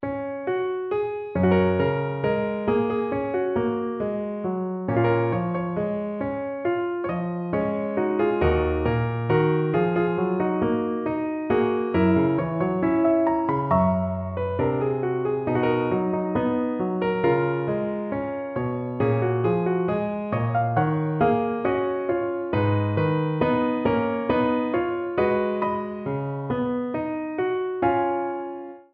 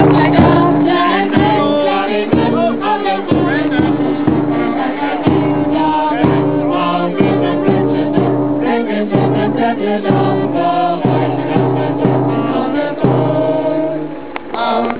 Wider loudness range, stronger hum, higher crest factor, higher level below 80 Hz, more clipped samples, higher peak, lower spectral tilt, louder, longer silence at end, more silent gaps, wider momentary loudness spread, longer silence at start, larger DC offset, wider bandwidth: about the same, 3 LU vs 1 LU; neither; about the same, 14 dB vs 14 dB; second, -46 dBFS vs -40 dBFS; neither; second, -8 dBFS vs 0 dBFS; about the same, -11.5 dB/octave vs -11 dB/octave; second, -24 LUFS vs -14 LUFS; about the same, 0.1 s vs 0 s; neither; first, 7 LU vs 4 LU; about the same, 0 s vs 0 s; second, under 0.1% vs 2%; first, 5 kHz vs 4 kHz